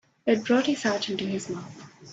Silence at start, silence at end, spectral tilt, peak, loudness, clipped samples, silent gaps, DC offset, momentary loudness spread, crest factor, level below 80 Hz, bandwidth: 0.25 s; 0 s; -4.5 dB/octave; -10 dBFS; -26 LUFS; under 0.1%; none; under 0.1%; 16 LU; 16 dB; -70 dBFS; 8 kHz